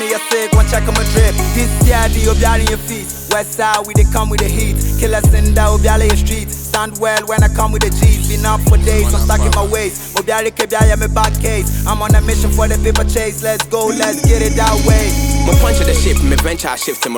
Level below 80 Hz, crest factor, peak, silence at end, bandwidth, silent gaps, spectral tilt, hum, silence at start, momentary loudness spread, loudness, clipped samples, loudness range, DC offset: -14 dBFS; 12 dB; 0 dBFS; 0 s; 19.5 kHz; none; -4.5 dB/octave; none; 0 s; 5 LU; -14 LUFS; under 0.1%; 1 LU; under 0.1%